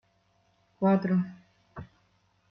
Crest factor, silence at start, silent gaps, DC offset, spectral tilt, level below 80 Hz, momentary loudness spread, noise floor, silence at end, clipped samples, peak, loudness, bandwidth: 18 dB; 0.8 s; none; under 0.1%; -10.5 dB/octave; -66 dBFS; 22 LU; -69 dBFS; 0.65 s; under 0.1%; -14 dBFS; -28 LUFS; 5.6 kHz